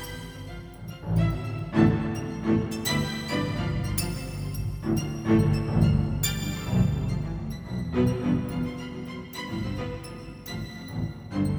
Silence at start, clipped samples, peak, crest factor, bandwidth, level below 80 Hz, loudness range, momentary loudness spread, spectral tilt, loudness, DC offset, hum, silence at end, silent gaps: 0 s; under 0.1%; -8 dBFS; 20 dB; over 20 kHz; -40 dBFS; 5 LU; 14 LU; -6 dB/octave; -28 LUFS; under 0.1%; none; 0 s; none